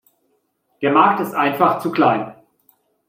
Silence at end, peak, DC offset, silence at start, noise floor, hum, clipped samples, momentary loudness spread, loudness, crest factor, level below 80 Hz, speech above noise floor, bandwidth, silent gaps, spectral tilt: 0.75 s; -2 dBFS; under 0.1%; 0.8 s; -67 dBFS; none; under 0.1%; 9 LU; -17 LUFS; 18 dB; -68 dBFS; 50 dB; 16 kHz; none; -6.5 dB/octave